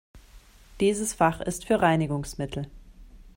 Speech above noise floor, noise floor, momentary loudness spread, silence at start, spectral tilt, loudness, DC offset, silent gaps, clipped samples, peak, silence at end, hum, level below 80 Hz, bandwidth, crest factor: 26 dB; -52 dBFS; 11 LU; 0.15 s; -5 dB/octave; -26 LUFS; under 0.1%; none; under 0.1%; -8 dBFS; 0.05 s; none; -48 dBFS; 16 kHz; 20 dB